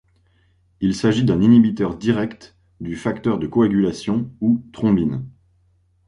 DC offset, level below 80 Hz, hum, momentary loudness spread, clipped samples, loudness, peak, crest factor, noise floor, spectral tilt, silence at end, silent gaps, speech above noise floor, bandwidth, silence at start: under 0.1%; -48 dBFS; none; 14 LU; under 0.1%; -19 LUFS; -4 dBFS; 16 dB; -60 dBFS; -7.5 dB/octave; 0.75 s; none; 42 dB; 10.5 kHz; 0.8 s